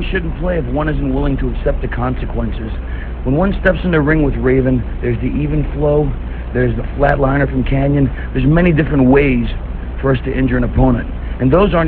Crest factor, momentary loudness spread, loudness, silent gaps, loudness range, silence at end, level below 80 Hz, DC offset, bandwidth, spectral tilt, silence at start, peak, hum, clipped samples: 14 dB; 10 LU; -16 LUFS; none; 4 LU; 0 s; -20 dBFS; 0.7%; 4.4 kHz; -11 dB/octave; 0 s; 0 dBFS; none; under 0.1%